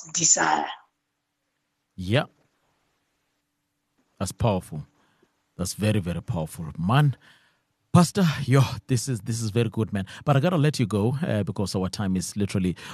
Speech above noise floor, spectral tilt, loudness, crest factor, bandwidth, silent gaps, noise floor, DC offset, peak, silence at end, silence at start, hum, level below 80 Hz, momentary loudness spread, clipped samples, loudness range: 54 dB; -5 dB/octave; -24 LUFS; 20 dB; 13 kHz; none; -78 dBFS; under 0.1%; -4 dBFS; 0 s; 0 s; none; -54 dBFS; 13 LU; under 0.1%; 10 LU